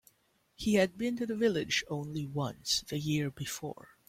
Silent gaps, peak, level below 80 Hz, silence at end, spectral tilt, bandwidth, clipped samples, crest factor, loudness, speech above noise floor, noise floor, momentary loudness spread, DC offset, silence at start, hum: none; -14 dBFS; -62 dBFS; 0.35 s; -4.5 dB/octave; 16.5 kHz; under 0.1%; 20 dB; -33 LUFS; 39 dB; -72 dBFS; 10 LU; under 0.1%; 0.6 s; none